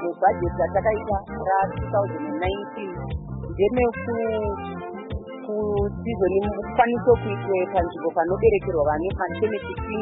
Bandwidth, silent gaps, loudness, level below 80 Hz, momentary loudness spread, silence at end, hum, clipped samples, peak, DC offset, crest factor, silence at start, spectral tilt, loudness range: 4 kHz; none; -24 LUFS; -40 dBFS; 12 LU; 0 s; none; under 0.1%; -6 dBFS; under 0.1%; 18 dB; 0 s; -11.5 dB/octave; 4 LU